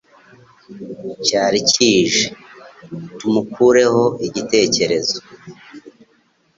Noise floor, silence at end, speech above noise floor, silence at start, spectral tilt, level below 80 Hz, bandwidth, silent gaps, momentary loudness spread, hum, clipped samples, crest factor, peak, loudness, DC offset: -59 dBFS; 0.7 s; 42 dB; 0.7 s; -3 dB/octave; -56 dBFS; 7.8 kHz; none; 19 LU; none; under 0.1%; 18 dB; -2 dBFS; -16 LUFS; under 0.1%